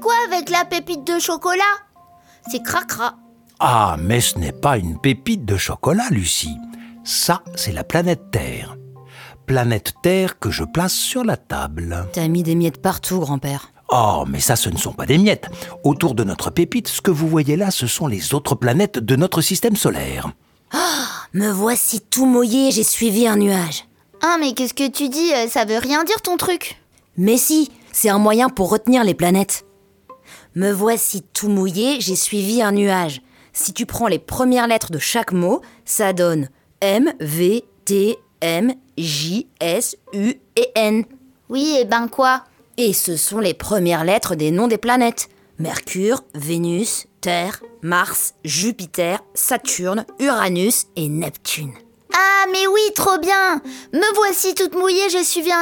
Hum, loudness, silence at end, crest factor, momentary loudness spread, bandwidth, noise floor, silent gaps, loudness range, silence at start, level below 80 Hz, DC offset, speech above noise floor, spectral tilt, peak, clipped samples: none; -18 LUFS; 0 s; 18 dB; 9 LU; 19 kHz; -50 dBFS; none; 4 LU; 0 s; -44 dBFS; under 0.1%; 32 dB; -4 dB/octave; -2 dBFS; under 0.1%